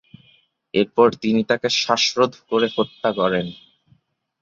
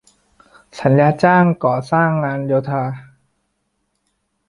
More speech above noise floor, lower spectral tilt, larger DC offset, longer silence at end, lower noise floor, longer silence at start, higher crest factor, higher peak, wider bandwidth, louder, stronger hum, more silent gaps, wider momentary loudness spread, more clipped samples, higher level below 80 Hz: second, 41 dB vs 54 dB; second, -4 dB/octave vs -8.5 dB/octave; neither; second, 0.9 s vs 1.45 s; second, -61 dBFS vs -70 dBFS; about the same, 0.75 s vs 0.75 s; about the same, 20 dB vs 16 dB; about the same, -2 dBFS vs -2 dBFS; second, 7.8 kHz vs 11 kHz; second, -20 LUFS vs -16 LUFS; neither; neither; second, 6 LU vs 10 LU; neither; about the same, -60 dBFS vs -56 dBFS